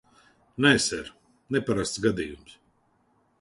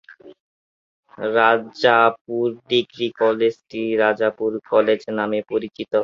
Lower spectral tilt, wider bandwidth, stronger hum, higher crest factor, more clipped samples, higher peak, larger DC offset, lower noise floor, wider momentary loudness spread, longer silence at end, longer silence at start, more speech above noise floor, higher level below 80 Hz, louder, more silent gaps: second, -4 dB/octave vs -5.5 dB/octave; first, 11.5 kHz vs 7.2 kHz; neither; first, 24 dB vs 18 dB; neither; second, -6 dBFS vs -2 dBFS; neither; second, -67 dBFS vs under -90 dBFS; first, 23 LU vs 9 LU; first, 0.9 s vs 0 s; first, 0.6 s vs 0.1 s; second, 42 dB vs over 70 dB; first, -54 dBFS vs -66 dBFS; second, -25 LUFS vs -20 LUFS; second, none vs 0.40-1.03 s, 2.21-2.25 s